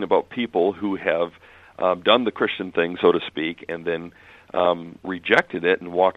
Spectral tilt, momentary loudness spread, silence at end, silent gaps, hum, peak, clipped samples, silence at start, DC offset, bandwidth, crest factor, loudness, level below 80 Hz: -6 dB/octave; 11 LU; 0.05 s; none; none; 0 dBFS; under 0.1%; 0 s; under 0.1%; 8.6 kHz; 22 dB; -22 LUFS; -62 dBFS